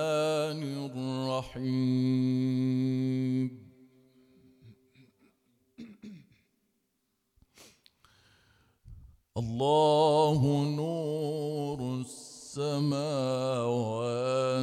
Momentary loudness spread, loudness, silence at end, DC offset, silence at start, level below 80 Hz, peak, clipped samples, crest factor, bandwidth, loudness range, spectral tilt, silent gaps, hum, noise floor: 16 LU; -30 LUFS; 0 s; under 0.1%; 0 s; -64 dBFS; -14 dBFS; under 0.1%; 16 dB; 13.5 kHz; 9 LU; -7 dB/octave; none; none; -79 dBFS